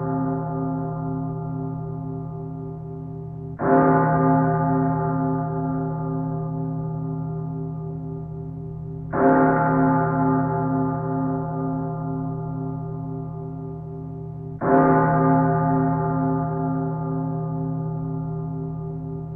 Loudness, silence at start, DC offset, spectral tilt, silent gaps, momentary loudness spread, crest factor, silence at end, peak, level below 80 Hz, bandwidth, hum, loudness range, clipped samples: -24 LUFS; 0 s; under 0.1%; -13.5 dB/octave; none; 15 LU; 18 dB; 0 s; -6 dBFS; -46 dBFS; 2.5 kHz; none; 8 LU; under 0.1%